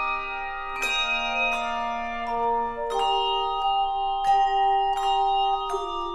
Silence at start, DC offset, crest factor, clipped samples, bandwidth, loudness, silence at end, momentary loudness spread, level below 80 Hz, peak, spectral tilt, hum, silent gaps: 0 s; under 0.1%; 12 dB; under 0.1%; 13.5 kHz; -25 LUFS; 0 s; 7 LU; -44 dBFS; -12 dBFS; -1.5 dB/octave; none; none